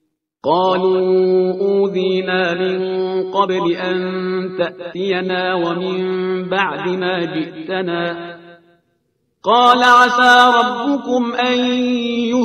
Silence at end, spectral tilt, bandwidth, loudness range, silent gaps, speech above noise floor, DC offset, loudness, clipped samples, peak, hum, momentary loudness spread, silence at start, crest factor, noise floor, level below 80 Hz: 0 s; -5 dB/octave; 10.5 kHz; 8 LU; none; 51 dB; under 0.1%; -16 LUFS; under 0.1%; 0 dBFS; none; 13 LU; 0.45 s; 16 dB; -66 dBFS; -62 dBFS